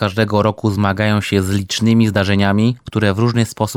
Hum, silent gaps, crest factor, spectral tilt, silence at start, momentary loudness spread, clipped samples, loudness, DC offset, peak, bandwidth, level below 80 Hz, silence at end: none; none; 14 dB; -6 dB/octave; 0 s; 4 LU; under 0.1%; -16 LUFS; under 0.1%; 0 dBFS; 16 kHz; -48 dBFS; 0 s